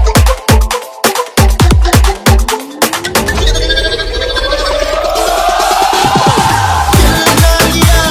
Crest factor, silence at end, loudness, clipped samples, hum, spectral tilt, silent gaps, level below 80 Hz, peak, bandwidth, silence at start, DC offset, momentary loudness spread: 10 dB; 0 s; -10 LUFS; 1%; none; -4 dB/octave; none; -14 dBFS; 0 dBFS; 19 kHz; 0 s; under 0.1%; 5 LU